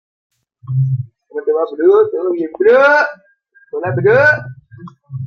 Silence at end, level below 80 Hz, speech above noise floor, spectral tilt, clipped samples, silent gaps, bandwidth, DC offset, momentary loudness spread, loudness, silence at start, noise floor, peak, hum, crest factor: 0 s; -58 dBFS; 24 dB; -8 dB/octave; under 0.1%; none; 6.6 kHz; under 0.1%; 14 LU; -14 LUFS; 0.7 s; -37 dBFS; 0 dBFS; none; 14 dB